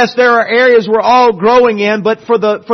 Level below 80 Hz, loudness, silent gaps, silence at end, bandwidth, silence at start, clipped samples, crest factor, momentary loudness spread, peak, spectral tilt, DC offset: -52 dBFS; -9 LUFS; none; 0 s; 6.4 kHz; 0 s; under 0.1%; 10 dB; 5 LU; 0 dBFS; -5 dB/octave; under 0.1%